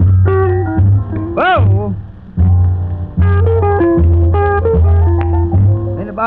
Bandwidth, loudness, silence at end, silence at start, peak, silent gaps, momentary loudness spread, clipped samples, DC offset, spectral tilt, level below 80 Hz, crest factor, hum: 3.8 kHz; -12 LUFS; 0 s; 0 s; -2 dBFS; none; 8 LU; under 0.1%; 0.4%; -11.5 dB/octave; -20 dBFS; 8 dB; none